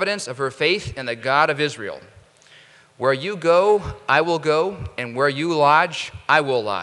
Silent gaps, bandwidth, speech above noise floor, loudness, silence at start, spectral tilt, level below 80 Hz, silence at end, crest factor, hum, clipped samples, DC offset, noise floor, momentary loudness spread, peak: none; 11.5 kHz; 30 dB; -20 LUFS; 0 s; -4.5 dB/octave; -50 dBFS; 0 s; 20 dB; none; under 0.1%; under 0.1%; -50 dBFS; 12 LU; 0 dBFS